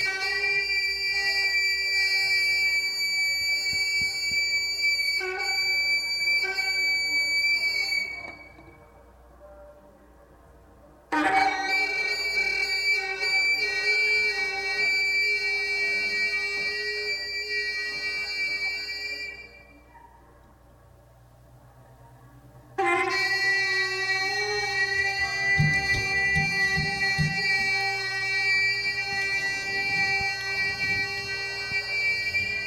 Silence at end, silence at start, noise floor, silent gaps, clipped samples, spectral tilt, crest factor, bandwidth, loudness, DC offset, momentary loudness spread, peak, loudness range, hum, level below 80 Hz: 0 s; 0 s; -54 dBFS; none; under 0.1%; -2 dB/octave; 18 dB; 17.5 kHz; -23 LUFS; under 0.1%; 6 LU; -10 dBFS; 8 LU; none; -52 dBFS